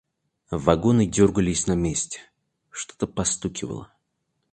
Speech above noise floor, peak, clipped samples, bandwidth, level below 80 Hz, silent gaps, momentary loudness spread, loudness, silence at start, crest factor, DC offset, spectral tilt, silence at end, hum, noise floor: 53 dB; 0 dBFS; under 0.1%; 10 kHz; -44 dBFS; none; 16 LU; -23 LUFS; 0.5 s; 24 dB; under 0.1%; -5 dB/octave; 0.65 s; none; -75 dBFS